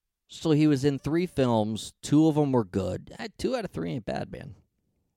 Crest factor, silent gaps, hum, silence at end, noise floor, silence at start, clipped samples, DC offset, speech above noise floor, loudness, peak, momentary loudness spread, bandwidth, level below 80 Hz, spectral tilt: 16 dB; none; none; 0.65 s; -75 dBFS; 0.3 s; under 0.1%; under 0.1%; 49 dB; -27 LUFS; -10 dBFS; 16 LU; 13 kHz; -54 dBFS; -7 dB/octave